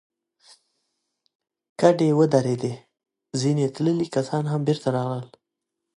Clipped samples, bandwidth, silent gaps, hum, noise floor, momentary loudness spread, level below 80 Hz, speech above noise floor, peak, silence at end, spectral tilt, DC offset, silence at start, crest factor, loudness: under 0.1%; 11 kHz; none; none; -83 dBFS; 13 LU; -68 dBFS; 61 dB; -2 dBFS; 0.7 s; -7 dB/octave; under 0.1%; 1.8 s; 22 dB; -23 LUFS